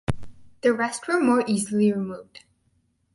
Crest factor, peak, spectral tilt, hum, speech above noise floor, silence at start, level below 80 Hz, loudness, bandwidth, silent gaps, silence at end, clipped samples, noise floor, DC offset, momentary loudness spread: 18 dB; -6 dBFS; -5.5 dB/octave; none; 45 dB; 0.1 s; -48 dBFS; -23 LUFS; 11.5 kHz; none; 0.75 s; under 0.1%; -68 dBFS; under 0.1%; 13 LU